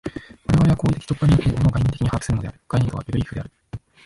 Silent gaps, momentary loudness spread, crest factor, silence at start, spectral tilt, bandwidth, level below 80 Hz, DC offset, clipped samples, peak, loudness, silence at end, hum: none; 16 LU; 14 dB; 0.05 s; -7.5 dB/octave; 11.5 kHz; -34 dBFS; under 0.1%; under 0.1%; -8 dBFS; -21 LUFS; 0.3 s; none